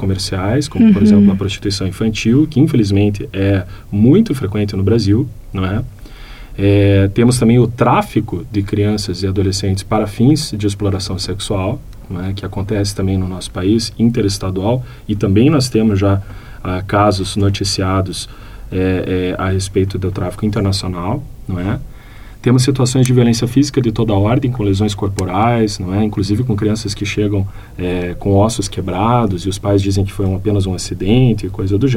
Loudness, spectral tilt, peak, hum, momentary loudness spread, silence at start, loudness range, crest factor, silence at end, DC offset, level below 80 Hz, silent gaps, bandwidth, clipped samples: -15 LUFS; -6.5 dB/octave; -2 dBFS; none; 10 LU; 0 s; 4 LU; 14 dB; 0 s; under 0.1%; -34 dBFS; none; 14.5 kHz; under 0.1%